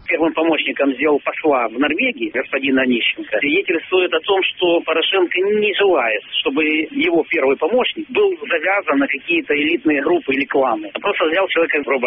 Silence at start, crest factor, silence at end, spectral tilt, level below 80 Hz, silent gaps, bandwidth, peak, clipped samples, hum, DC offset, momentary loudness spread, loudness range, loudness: 0.05 s; 12 dB; 0 s; -0.5 dB/octave; -58 dBFS; none; 3.9 kHz; -4 dBFS; under 0.1%; none; under 0.1%; 3 LU; 1 LU; -17 LUFS